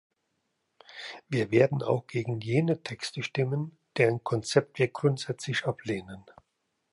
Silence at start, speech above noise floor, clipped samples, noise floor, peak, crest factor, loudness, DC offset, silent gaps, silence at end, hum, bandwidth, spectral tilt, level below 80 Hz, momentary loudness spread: 0.9 s; 51 dB; under 0.1%; -79 dBFS; -8 dBFS; 22 dB; -29 LUFS; under 0.1%; none; 0.7 s; none; 11.5 kHz; -6 dB/octave; -68 dBFS; 14 LU